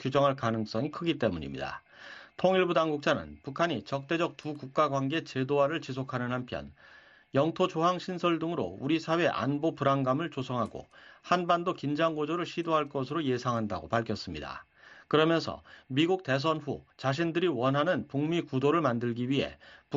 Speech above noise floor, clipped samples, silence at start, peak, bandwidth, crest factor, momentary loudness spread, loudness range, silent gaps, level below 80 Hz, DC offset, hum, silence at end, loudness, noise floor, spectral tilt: 20 dB; under 0.1%; 0 s; -10 dBFS; 7.8 kHz; 20 dB; 11 LU; 2 LU; none; -62 dBFS; under 0.1%; none; 0 s; -30 LUFS; -50 dBFS; -4.5 dB/octave